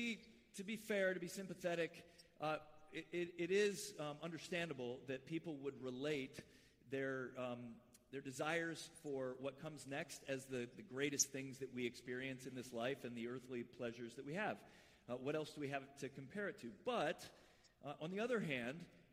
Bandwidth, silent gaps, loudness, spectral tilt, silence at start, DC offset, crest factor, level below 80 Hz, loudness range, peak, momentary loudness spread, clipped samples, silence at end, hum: 15.5 kHz; none; -46 LUFS; -4 dB/octave; 0 s; under 0.1%; 26 dB; -80 dBFS; 3 LU; -20 dBFS; 12 LU; under 0.1%; 0.1 s; none